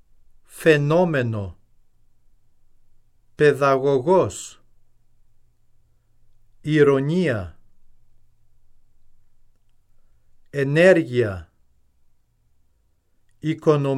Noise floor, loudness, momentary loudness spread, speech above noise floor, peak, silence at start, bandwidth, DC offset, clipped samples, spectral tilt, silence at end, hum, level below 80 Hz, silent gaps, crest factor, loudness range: -63 dBFS; -19 LUFS; 18 LU; 44 dB; -4 dBFS; 0.55 s; 14 kHz; under 0.1%; under 0.1%; -6.5 dB/octave; 0 s; none; -54 dBFS; none; 20 dB; 2 LU